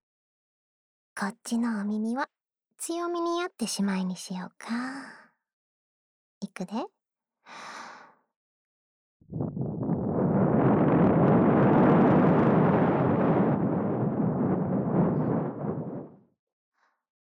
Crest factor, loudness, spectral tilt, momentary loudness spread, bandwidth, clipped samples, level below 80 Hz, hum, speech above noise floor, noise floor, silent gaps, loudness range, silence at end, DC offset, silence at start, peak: 16 dB; -26 LUFS; -7.5 dB/octave; 20 LU; 15.5 kHz; under 0.1%; -58 dBFS; none; 51 dB; -82 dBFS; 5.53-6.41 s, 8.36-9.20 s; 19 LU; 1.2 s; under 0.1%; 1.15 s; -10 dBFS